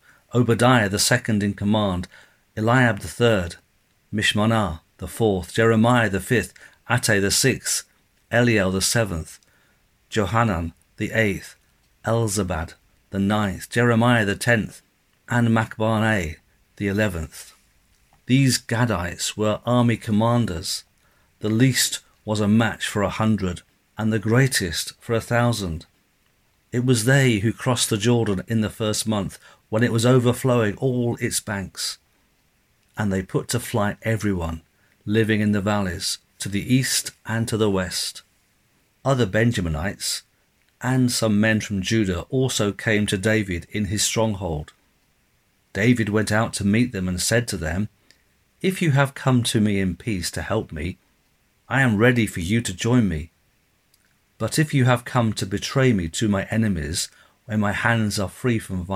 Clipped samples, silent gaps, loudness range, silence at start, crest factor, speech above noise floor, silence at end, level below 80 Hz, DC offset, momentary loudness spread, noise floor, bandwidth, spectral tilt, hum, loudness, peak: under 0.1%; none; 3 LU; 0.35 s; 20 dB; 43 dB; 0 s; -46 dBFS; under 0.1%; 11 LU; -64 dBFS; 16 kHz; -5 dB/octave; none; -22 LUFS; -2 dBFS